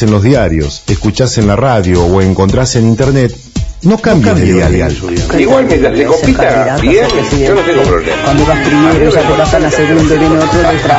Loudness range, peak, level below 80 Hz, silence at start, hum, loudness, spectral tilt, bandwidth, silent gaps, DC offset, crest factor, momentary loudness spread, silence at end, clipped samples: 1 LU; 0 dBFS; -22 dBFS; 0 s; none; -9 LUFS; -6 dB/octave; 8 kHz; none; under 0.1%; 8 dB; 5 LU; 0 s; 0.8%